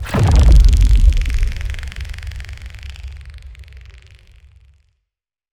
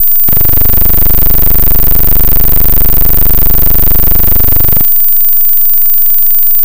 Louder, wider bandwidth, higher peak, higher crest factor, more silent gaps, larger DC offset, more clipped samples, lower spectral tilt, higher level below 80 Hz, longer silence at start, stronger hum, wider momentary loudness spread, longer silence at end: second, -15 LUFS vs -5 LUFS; second, 11 kHz vs 17.5 kHz; about the same, 0 dBFS vs 0 dBFS; first, 16 dB vs 2 dB; neither; second, under 0.1% vs 50%; second, under 0.1% vs 5%; about the same, -6 dB/octave vs -5 dB/octave; about the same, -16 dBFS vs -14 dBFS; about the same, 0 s vs 0 s; neither; first, 24 LU vs 1 LU; first, 1.8 s vs 0 s